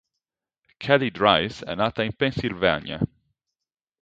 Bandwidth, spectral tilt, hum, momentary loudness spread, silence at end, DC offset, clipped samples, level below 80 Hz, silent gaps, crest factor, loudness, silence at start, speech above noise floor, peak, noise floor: 7.8 kHz; -6.5 dB/octave; none; 10 LU; 0.95 s; under 0.1%; under 0.1%; -50 dBFS; none; 22 dB; -23 LUFS; 0.8 s; 65 dB; -2 dBFS; -88 dBFS